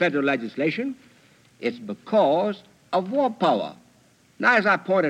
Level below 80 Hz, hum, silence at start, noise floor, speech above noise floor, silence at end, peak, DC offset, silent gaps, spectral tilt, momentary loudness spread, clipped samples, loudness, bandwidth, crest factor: -76 dBFS; none; 0 s; -58 dBFS; 36 dB; 0 s; -6 dBFS; under 0.1%; none; -6 dB/octave; 13 LU; under 0.1%; -23 LUFS; 10 kHz; 18 dB